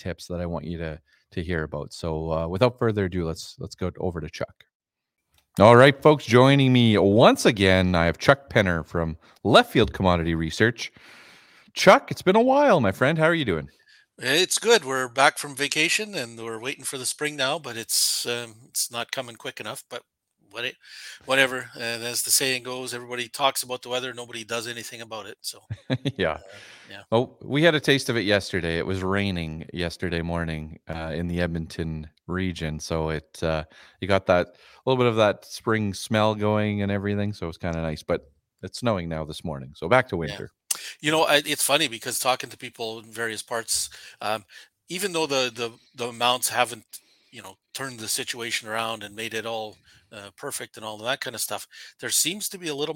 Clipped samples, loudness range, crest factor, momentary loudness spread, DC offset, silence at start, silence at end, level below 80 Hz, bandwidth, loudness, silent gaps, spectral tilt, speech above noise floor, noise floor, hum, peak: under 0.1%; 10 LU; 24 dB; 17 LU; under 0.1%; 0.05 s; 0 s; -52 dBFS; 17 kHz; -23 LUFS; 4.75-4.80 s; -4 dB/octave; 29 dB; -53 dBFS; none; 0 dBFS